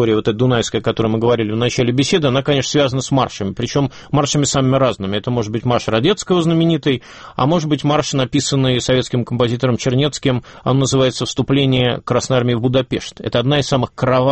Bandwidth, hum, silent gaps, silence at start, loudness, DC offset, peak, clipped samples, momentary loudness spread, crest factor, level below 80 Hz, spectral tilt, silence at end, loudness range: 8.6 kHz; none; none; 0 s; -16 LUFS; under 0.1%; -2 dBFS; under 0.1%; 5 LU; 14 dB; -44 dBFS; -5.5 dB/octave; 0 s; 1 LU